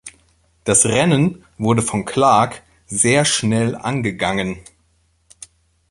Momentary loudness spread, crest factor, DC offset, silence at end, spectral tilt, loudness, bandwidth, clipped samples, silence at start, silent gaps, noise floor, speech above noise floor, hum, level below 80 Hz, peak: 12 LU; 18 dB; under 0.1%; 1.3 s; -4 dB/octave; -17 LUFS; 11.5 kHz; under 0.1%; 0.05 s; none; -61 dBFS; 44 dB; none; -48 dBFS; -2 dBFS